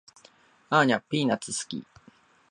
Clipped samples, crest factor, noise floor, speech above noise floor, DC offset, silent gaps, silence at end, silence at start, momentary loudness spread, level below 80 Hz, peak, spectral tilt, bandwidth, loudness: under 0.1%; 22 dB; -59 dBFS; 33 dB; under 0.1%; none; 0.7 s; 0.7 s; 13 LU; -72 dBFS; -6 dBFS; -4 dB/octave; 11.5 kHz; -26 LUFS